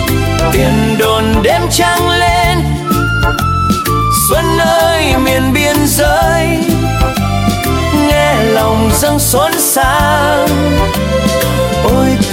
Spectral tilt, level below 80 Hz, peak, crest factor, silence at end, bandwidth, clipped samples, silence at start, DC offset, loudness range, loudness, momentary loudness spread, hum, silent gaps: -4.5 dB/octave; -22 dBFS; 0 dBFS; 10 dB; 0 s; 17 kHz; under 0.1%; 0 s; under 0.1%; 1 LU; -11 LUFS; 3 LU; none; none